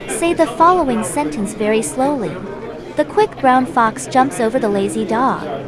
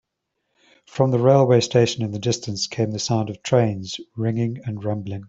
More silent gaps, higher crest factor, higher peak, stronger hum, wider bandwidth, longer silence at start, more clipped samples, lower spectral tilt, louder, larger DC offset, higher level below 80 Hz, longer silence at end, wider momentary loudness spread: neither; about the same, 16 dB vs 20 dB; about the same, 0 dBFS vs -2 dBFS; neither; first, 12 kHz vs 8 kHz; second, 0 s vs 0.95 s; neither; second, -4.5 dB/octave vs -6 dB/octave; first, -16 LUFS vs -21 LUFS; neither; first, -44 dBFS vs -60 dBFS; about the same, 0 s vs 0 s; about the same, 9 LU vs 11 LU